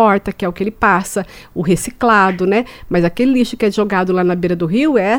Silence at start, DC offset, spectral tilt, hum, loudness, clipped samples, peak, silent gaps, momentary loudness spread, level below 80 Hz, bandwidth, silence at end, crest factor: 0 s; under 0.1%; -6 dB/octave; none; -15 LUFS; under 0.1%; 0 dBFS; none; 8 LU; -40 dBFS; 17.5 kHz; 0 s; 14 dB